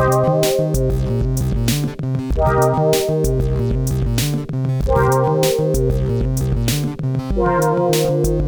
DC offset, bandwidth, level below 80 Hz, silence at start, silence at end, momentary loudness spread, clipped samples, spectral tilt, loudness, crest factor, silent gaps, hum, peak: 0.1%; over 20 kHz; -26 dBFS; 0 s; 0 s; 5 LU; under 0.1%; -6 dB/octave; -18 LUFS; 16 dB; none; none; 0 dBFS